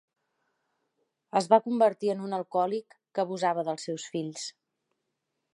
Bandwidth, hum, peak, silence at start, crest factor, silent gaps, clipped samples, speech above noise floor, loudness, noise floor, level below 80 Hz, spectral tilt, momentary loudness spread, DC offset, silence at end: 11.5 kHz; none; -8 dBFS; 1.35 s; 22 dB; none; under 0.1%; 54 dB; -28 LUFS; -82 dBFS; -86 dBFS; -5 dB/octave; 13 LU; under 0.1%; 1.05 s